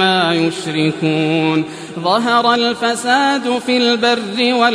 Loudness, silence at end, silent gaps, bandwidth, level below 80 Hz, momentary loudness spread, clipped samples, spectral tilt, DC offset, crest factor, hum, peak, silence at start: -15 LUFS; 0 s; none; 11 kHz; -62 dBFS; 5 LU; under 0.1%; -4.5 dB/octave; under 0.1%; 14 dB; none; -2 dBFS; 0 s